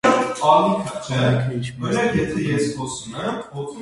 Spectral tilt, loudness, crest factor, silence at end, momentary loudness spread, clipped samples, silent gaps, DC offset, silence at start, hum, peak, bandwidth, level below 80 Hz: -5.5 dB/octave; -21 LUFS; 18 dB; 0 s; 12 LU; under 0.1%; none; under 0.1%; 0.05 s; none; -2 dBFS; 11.5 kHz; -48 dBFS